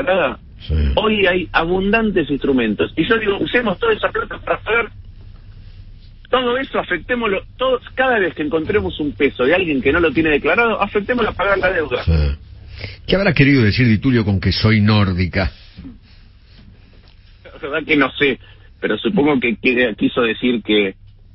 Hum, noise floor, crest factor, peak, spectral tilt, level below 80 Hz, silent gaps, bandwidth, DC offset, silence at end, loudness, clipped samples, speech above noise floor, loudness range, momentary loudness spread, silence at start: none; -44 dBFS; 18 dB; 0 dBFS; -10.5 dB/octave; -32 dBFS; none; 5.8 kHz; under 0.1%; 0.4 s; -17 LUFS; under 0.1%; 28 dB; 6 LU; 8 LU; 0 s